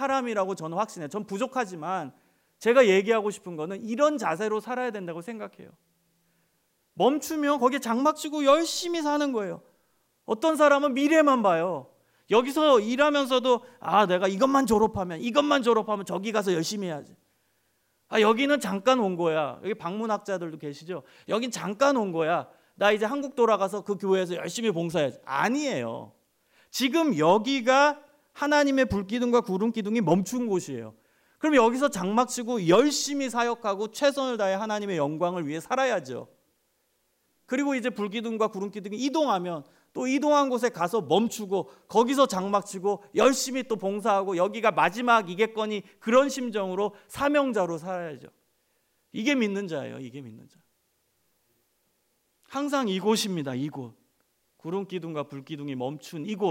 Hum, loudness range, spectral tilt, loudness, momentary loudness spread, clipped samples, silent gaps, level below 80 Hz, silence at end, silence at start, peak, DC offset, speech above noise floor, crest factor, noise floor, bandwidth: none; 8 LU; -4.5 dB/octave; -26 LUFS; 14 LU; under 0.1%; none; -64 dBFS; 0 s; 0 s; -8 dBFS; under 0.1%; 47 dB; 18 dB; -72 dBFS; 16 kHz